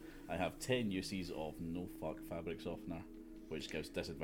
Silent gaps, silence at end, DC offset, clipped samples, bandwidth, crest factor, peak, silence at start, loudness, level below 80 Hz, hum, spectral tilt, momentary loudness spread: none; 0 s; under 0.1%; under 0.1%; 16.5 kHz; 22 dB; -22 dBFS; 0 s; -43 LUFS; -58 dBFS; none; -5 dB/octave; 11 LU